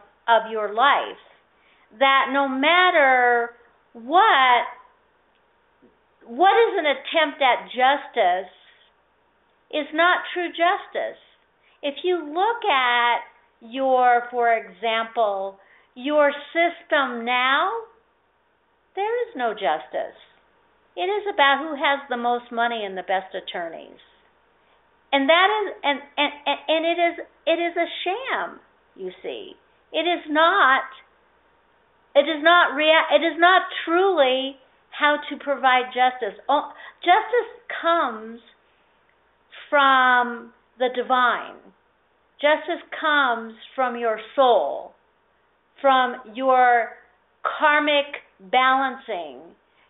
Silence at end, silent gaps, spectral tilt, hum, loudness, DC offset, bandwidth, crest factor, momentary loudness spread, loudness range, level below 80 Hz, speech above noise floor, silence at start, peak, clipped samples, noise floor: 0.45 s; none; 1.5 dB/octave; none; -21 LUFS; under 0.1%; 4.1 kHz; 20 dB; 15 LU; 6 LU; -72 dBFS; 44 dB; 0.25 s; -2 dBFS; under 0.1%; -65 dBFS